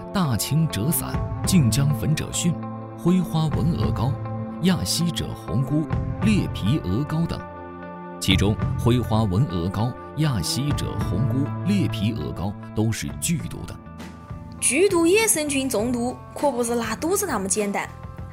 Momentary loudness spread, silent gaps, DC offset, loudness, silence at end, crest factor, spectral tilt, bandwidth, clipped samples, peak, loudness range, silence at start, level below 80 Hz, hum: 12 LU; none; under 0.1%; -23 LUFS; 0 s; 20 dB; -5 dB/octave; 16 kHz; under 0.1%; -2 dBFS; 3 LU; 0 s; -40 dBFS; none